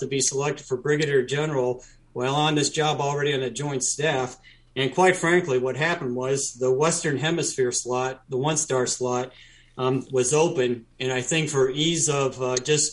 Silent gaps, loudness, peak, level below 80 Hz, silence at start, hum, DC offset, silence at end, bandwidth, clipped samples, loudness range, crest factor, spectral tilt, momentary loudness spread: none; -24 LUFS; -6 dBFS; -60 dBFS; 0 s; none; under 0.1%; 0 s; 11.5 kHz; under 0.1%; 2 LU; 18 dB; -3.5 dB/octave; 7 LU